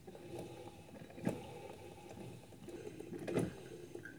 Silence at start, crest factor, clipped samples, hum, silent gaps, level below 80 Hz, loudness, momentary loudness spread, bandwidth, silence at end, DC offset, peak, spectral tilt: 0 s; 24 dB; under 0.1%; none; none; -70 dBFS; -47 LUFS; 14 LU; over 20 kHz; 0 s; under 0.1%; -22 dBFS; -6.5 dB/octave